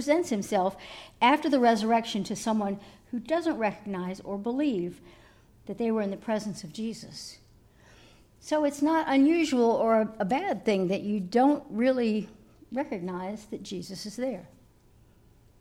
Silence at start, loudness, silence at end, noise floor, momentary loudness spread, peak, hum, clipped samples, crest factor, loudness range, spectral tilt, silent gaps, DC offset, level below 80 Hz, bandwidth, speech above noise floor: 0 s; -28 LUFS; 1.15 s; -59 dBFS; 15 LU; -8 dBFS; none; under 0.1%; 20 dB; 9 LU; -5.5 dB/octave; none; under 0.1%; -62 dBFS; 15.5 kHz; 31 dB